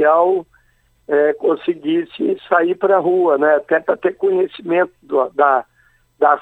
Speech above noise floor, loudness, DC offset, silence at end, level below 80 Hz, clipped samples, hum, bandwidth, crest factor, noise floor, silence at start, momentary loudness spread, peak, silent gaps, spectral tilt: 42 dB; -17 LUFS; under 0.1%; 0 s; -64 dBFS; under 0.1%; none; 4.2 kHz; 16 dB; -58 dBFS; 0 s; 6 LU; 0 dBFS; none; -7.5 dB/octave